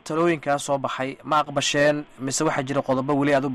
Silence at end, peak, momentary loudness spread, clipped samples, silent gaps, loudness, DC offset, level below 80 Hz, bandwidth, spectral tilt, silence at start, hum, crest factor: 0 s; -10 dBFS; 7 LU; under 0.1%; none; -23 LUFS; under 0.1%; -58 dBFS; 14 kHz; -4.5 dB/octave; 0.05 s; none; 14 dB